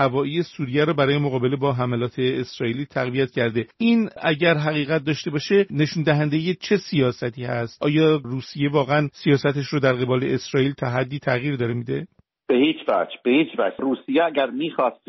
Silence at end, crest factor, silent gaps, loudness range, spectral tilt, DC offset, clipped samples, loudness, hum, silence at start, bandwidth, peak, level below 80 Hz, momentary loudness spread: 0.15 s; 18 dB; none; 2 LU; -5 dB/octave; under 0.1%; under 0.1%; -22 LUFS; none; 0 s; 6.2 kHz; -4 dBFS; -58 dBFS; 6 LU